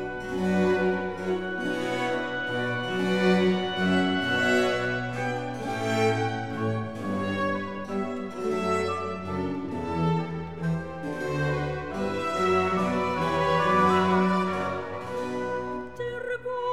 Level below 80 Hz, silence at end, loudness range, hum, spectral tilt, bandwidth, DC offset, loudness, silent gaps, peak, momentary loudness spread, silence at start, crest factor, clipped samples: -54 dBFS; 0 s; 5 LU; none; -6 dB/octave; 13.5 kHz; 0.4%; -27 LUFS; none; -10 dBFS; 9 LU; 0 s; 18 dB; under 0.1%